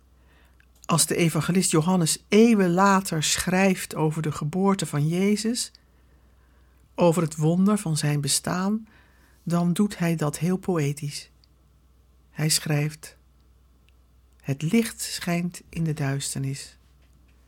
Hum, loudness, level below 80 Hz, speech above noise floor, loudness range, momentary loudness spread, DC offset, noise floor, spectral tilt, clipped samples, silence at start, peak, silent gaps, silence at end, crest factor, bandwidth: none; -24 LUFS; -56 dBFS; 35 dB; 8 LU; 13 LU; under 0.1%; -58 dBFS; -5 dB/octave; under 0.1%; 0.9 s; -6 dBFS; none; 0.8 s; 18 dB; 17.5 kHz